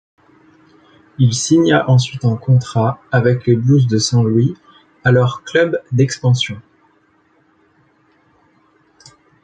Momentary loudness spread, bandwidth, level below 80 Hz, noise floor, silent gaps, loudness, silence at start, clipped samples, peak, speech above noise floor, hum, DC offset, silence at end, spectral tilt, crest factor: 6 LU; 9.2 kHz; -52 dBFS; -56 dBFS; none; -15 LUFS; 1.2 s; under 0.1%; -2 dBFS; 42 dB; none; under 0.1%; 2.85 s; -6 dB/octave; 14 dB